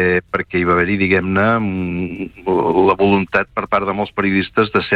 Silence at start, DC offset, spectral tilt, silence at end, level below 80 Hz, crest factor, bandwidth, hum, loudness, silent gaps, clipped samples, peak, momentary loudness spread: 0 s; under 0.1%; -8.5 dB/octave; 0 s; -44 dBFS; 14 dB; 5.4 kHz; none; -17 LUFS; none; under 0.1%; -2 dBFS; 7 LU